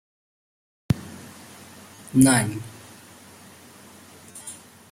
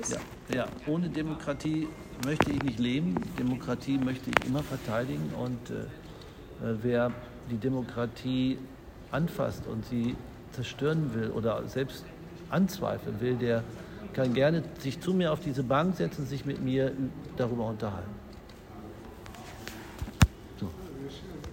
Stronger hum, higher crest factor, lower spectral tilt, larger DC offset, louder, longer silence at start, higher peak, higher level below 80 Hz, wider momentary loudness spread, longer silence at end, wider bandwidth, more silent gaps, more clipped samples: neither; about the same, 26 dB vs 30 dB; second, -4.5 dB/octave vs -6 dB/octave; neither; first, -21 LUFS vs -32 LUFS; first, 0.9 s vs 0 s; about the same, -2 dBFS vs 0 dBFS; second, -54 dBFS vs -48 dBFS; first, 28 LU vs 15 LU; first, 0.4 s vs 0 s; about the same, 16 kHz vs 16 kHz; neither; neither